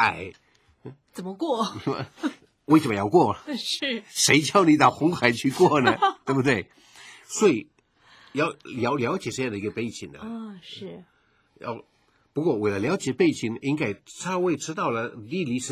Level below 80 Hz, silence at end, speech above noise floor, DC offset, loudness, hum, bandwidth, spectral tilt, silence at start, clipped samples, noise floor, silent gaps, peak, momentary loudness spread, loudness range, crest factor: -60 dBFS; 0 s; 38 dB; under 0.1%; -24 LUFS; none; 16 kHz; -4.5 dB/octave; 0 s; under 0.1%; -62 dBFS; none; -2 dBFS; 18 LU; 10 LU; 24 dB